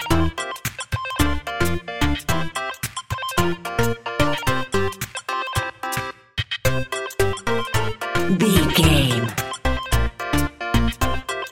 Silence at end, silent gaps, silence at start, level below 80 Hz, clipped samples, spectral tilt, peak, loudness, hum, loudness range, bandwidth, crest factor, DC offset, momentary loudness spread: 0 s; none; 0 s; -32 dBFS; under 0.1%; -4.5 dB/octave; -2 dBFS; -22 LUFS; none; 4 LU; 17 kHz; 20 dB; 2%; 10 LU